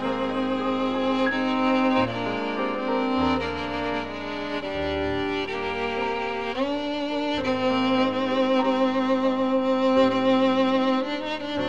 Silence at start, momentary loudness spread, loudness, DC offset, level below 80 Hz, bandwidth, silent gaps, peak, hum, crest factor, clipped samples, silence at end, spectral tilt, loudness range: 0 s; 7 LU; -24 LUFS; 0.6%; -50 dBFS; 7.8 kHz; none; -10 dBFS; none; 14 dB; under 0.1%; 0 s; -6 dB/octave; 5 LU